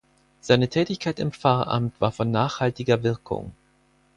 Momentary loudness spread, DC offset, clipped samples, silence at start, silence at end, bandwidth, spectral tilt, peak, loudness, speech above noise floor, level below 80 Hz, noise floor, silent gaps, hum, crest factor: 11 LU; under 0.1%; under 0.1%; 0.45 s; 0.65 s; 10.5 kHz; -6.5 dB/octave; -4 dBFS; -24 LUFS; 39 dB; -54 dBFS; -62 dBFS; none; none; 20 dB